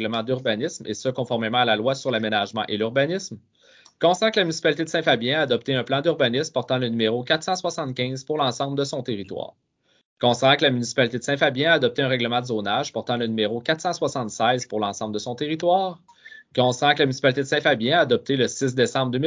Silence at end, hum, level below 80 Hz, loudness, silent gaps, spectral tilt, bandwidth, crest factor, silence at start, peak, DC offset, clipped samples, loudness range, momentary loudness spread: 0 s; none; -66 dBFS; -22 LUFS; 10.05-10.17 s; -4.5 dB/octave; 7.8 kHz; 20 dB; 0 s; -4 dBFS; under 0.1%; under 0.1%; 3 LU; 8 LU